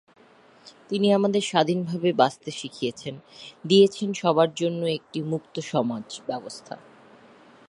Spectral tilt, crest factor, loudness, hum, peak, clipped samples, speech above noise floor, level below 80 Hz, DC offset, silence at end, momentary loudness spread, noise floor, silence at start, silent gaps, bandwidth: -5.5 dB/octave; 22 dB; -24 LUFS; none; -4 dBFS; under 0.1%; 30 dB; -72 dBFS; under 0.1%; 0.95 s; 18 LU; -54 dBFS; 0.65 s; none; 11 kHz